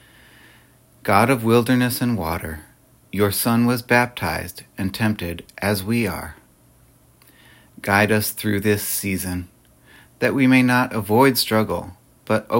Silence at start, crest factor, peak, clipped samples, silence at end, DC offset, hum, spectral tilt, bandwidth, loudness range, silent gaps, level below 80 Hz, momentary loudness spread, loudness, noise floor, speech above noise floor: 1.05 s; 20 dB; -2 dBFS; under 0.1%; 0 s; under 0.1%; none; -5 dB/octave; 17 kHz; 5 LU; none; -52 dBFS; 15 LU; -20 LUFS; -54 dBFS; 34 dB